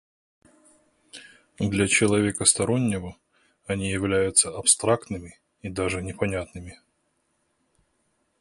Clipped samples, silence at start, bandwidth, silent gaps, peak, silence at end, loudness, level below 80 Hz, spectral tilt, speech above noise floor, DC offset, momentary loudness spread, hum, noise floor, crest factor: under 0.1%; 1.15 s; 11.5 kHz; none; -2 dBFS; 1.65 s; -23 LUFS; -50 dBFS; -3.5 dB/octave; 48 dB; under 0.1%; 22 LU; none; -72 dBFS; 26 dB